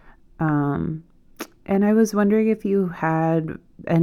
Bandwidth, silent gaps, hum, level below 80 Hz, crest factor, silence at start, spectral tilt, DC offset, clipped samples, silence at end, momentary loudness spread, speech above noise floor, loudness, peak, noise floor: 15 kHz; none; none; -52 dBFS; 14 dB; 0.4 s; -8 dB/octave; under 0.1%; under 0.1%; 0 s; 17 LU; 20 dB; -21 LUFS; -6 dBFS; -40 dBFS